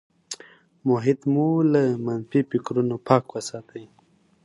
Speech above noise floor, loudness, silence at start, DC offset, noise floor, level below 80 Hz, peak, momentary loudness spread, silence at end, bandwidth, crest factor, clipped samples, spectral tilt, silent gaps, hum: 38 dB; -23 LUFS; 0.3 s; under 0.1%; -60 dBFS; -68 dBFS; -2 dBFS; 17 LU; 0.6 s; 11.5 kHz; 22 dB; under 0.1%; -7 dB/octave; none; none